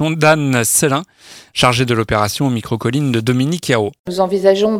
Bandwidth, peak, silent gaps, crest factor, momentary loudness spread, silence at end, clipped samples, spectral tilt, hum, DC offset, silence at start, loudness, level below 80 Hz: 16.5 kHz; 0 dBFS; 3.99-4.04 s; 16 dB; 7 LU; 0 s; under 0.1%; -4.5 dB/octave; none; under 0.1%; 0 s; -15 LUFS; -44 dBFS